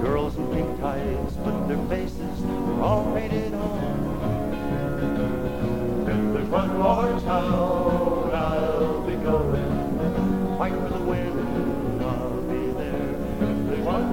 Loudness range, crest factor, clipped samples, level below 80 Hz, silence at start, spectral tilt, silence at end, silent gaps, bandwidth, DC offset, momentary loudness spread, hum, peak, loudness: 3 LU; 16 dB; under 0.1%; -36 dBFS; 0 s; -8 dB/octave; 0 s; none; 17 kHz; 1%; 5 LU; none; -8 dBFS; -25 LUFS